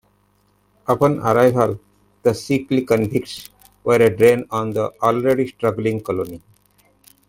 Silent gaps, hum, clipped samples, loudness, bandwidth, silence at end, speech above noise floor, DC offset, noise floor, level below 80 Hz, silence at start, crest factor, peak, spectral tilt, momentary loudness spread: none; 50 Hz at -50 dBFS; under 0.1%; -18 LUFS; 16.5 kHz; 0.9 s; 43 dB; under 0.1%; -61 dBFS; -54 dBFS; 0.9 s; 18 dB; -2 dBFS; -6.5 dB/octave; 12 LU